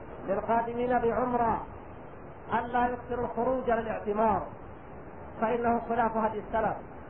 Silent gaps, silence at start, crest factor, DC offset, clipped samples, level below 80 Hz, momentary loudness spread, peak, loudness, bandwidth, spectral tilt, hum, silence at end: none; 0 s; 16 dB; 0.3%; under 0.1%; -52 dBFS; 18 LU; -14 dBFS; -30 LUFS; 3.6 kHz; -10.5 dB/octave; none; 0 s